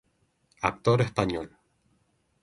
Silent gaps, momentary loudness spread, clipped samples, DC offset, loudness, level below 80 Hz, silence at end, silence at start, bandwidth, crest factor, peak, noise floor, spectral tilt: none; 11 LU; under 0.1%; under 0.1%; -27 LUFS; -54 dBFS; 0.95 s; 0.6 s; 11.5 kHz; 24 dB; -6 dBFS; -70 dBFS; -6.5 dB/octave